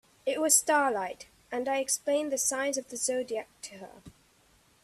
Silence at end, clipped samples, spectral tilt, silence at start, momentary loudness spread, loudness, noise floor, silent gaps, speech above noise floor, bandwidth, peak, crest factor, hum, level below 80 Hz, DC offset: 0.75 s; under 0.1%; -1 dB/octave; 0.25 s; 21 LU; -28 LUFS; -64 dBFS; none; 34 dB; 15 kHz; -10 dBFS; 22 dB; none; -70 dBFS; under 0.1%